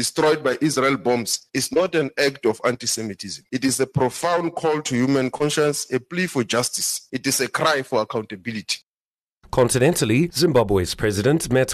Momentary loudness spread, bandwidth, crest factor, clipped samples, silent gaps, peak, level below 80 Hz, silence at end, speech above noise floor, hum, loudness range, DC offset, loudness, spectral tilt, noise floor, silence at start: 8 LU; 13.5 kHz; 14 dB; under 0.1%; 8.83-9.18 s, 9.31-9.41 s; -8 dBFS; -48 dBFS; 0 s; over 69 dB; none; 2 LU; under 0.1%; -21 LUFS; -4 dB/octave; under -90 dBFS; 0 s